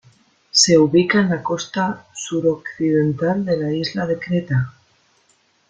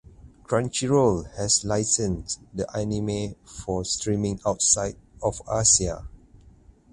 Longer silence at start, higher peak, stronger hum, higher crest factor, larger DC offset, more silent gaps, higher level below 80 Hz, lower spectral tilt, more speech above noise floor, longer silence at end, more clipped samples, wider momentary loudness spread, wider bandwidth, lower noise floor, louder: first, 0.55 s vs 0.25 s; first, -2 dBFS vs -6 dBFS; neither; about the same, 18 dB vs 20 dB; neither; neither; second, -56 dBFS vs -44 dBFS; about the same, -4.5 dB/octave vs -3.5 dB/octave; first, 42 dB vs 28 dB; first, 1 s vs 0.75 s; neither; about the same, 10 LU vs 11 LU; second, 10 kHz vs 11.5 kHz; first, -60 dBFS vs -53 dBFS; first, -18 LUFS vs -24 LUFS